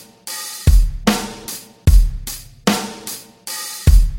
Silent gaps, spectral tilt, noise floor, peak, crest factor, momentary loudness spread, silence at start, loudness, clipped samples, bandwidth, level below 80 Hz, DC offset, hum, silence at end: none; -4.5 dB/octave; -33 dBFS; 0 dBFS; 16 dB; 14 LU; 0.25 s; -19 LUFS; under 0.1%; 17 kHz; -18 dBFS; under 0.1%; none; 0 s